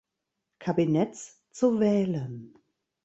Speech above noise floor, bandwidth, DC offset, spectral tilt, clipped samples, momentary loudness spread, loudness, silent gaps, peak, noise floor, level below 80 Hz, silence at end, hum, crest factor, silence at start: 58 dB; 8.2 kHz; under 0.1%; -7.5 dB/octave; under 0.1%; 20 LU; -27 LUFS; none; -12 dBFS; -84 dBFS; -68 dBFS; 0.55 s; none; 16 dB; 0.6 s